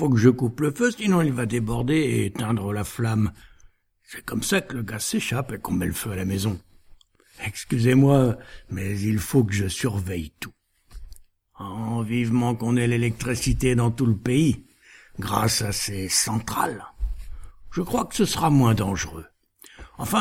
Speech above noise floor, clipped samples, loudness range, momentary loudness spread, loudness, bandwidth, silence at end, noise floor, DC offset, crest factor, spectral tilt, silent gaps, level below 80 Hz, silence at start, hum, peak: 32 dB; under 0.1%; 4 LU; 15 LU; -24 LUFS; 17 kHz; 0 s; -55 dBFS; under 0.1%; 20 dB; -5.5 dB/octave; none; -42 dBFS; 0 s; none; -4 dBFS